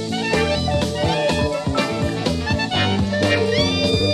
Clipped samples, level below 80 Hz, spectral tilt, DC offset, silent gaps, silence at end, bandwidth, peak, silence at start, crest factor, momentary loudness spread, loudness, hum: under 0.1%; -36 dBFS; -5 dB/octave; under 0.1%; none; 0 s; 13.5 kHz; -6 dBFS; 0 s; 14 dB; 4 LU; -19 LUFS; none